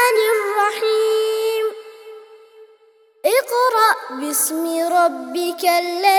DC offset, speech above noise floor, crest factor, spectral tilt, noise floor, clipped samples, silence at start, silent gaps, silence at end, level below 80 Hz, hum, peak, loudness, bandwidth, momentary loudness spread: under 0.1%; 36 dB; 18 dB; 0.5 dB/octave; -54 dBFS; under 0.1%; 0 s; none; 0 s; -78 dBFS; none; 0 dBFS; -18 LUFS; 20 kHz; 8 LU